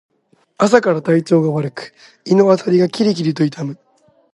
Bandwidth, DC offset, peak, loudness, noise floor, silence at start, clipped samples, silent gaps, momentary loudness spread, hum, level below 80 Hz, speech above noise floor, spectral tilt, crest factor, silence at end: 11.5 kHz; under 0.1%; 0 dBFS; -15 LUFS; -59 dBFS; 0.6 s; under 0.1%; none; 15 LU; none; -62 dBFS; 44 dB; -6.5 dB/octave; 16 dB; 0.6 s